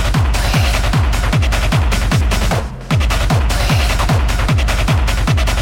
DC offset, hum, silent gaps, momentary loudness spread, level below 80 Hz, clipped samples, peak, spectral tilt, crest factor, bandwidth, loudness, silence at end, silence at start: under 0.1%; none; none; 1 LU; -16 dBFS; under 0.1%; -2 dBFS; -5 dB/octave; 12 dB; 17 kHz; -15 LUFS; 0 s; 0 s